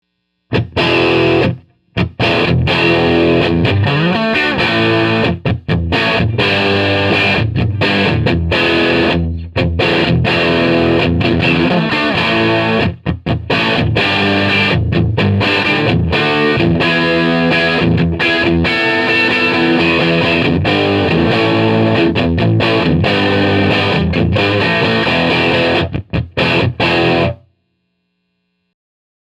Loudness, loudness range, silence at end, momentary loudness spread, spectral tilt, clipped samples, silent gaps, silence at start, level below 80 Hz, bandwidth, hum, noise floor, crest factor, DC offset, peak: -13 LUFS; 1 LU; 1.95 s; 4 LU; -7 dB/octave; under 0.1%; none; 0.5 s; -36 dBFS; 11.5 kHz; none; -67 dBFS; 12 dB; under 0.1%; 0 dBFS